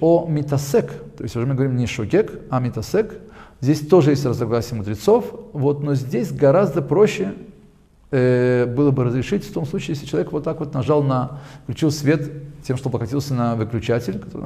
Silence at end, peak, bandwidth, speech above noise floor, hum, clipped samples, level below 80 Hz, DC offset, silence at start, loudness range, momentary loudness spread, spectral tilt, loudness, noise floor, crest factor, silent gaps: 0 s; -2 dBFS; 15 kHz; 31 dB; none; under 0.1%; -46 dBFS; under 0.1%; 0 s; 4 LU; 11 LU; -7.5 dB/octave; -20 LUFS; -50 dBFS; 18 dB; none